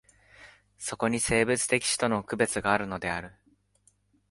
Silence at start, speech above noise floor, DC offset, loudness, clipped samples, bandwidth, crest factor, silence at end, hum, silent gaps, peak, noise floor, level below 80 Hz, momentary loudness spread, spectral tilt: 0.4 s; 39 dB; under 0.1%; -27 LUFS; under 0.1%; 12 kHz; 22 dB; 1 s; 50 Hz at -55 dBFS; none; -8 dBFS; -67 dBFS; -56 dBFS; 12 LU; -3.5 dB/octave